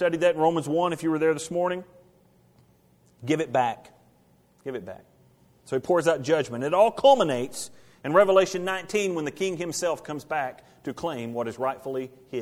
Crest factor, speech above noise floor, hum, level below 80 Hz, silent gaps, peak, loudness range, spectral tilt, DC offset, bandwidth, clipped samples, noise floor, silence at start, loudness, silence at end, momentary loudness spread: 20 dB; 36 dB; none; -66 dBFS; none; -6 dBFS; 9 LU; -4.5 dB/octave; under 0.1%; 15.5 kHz; under 0.1%; -61 dBFS; 0 s; -25 LUFS; 0 s; 17 LU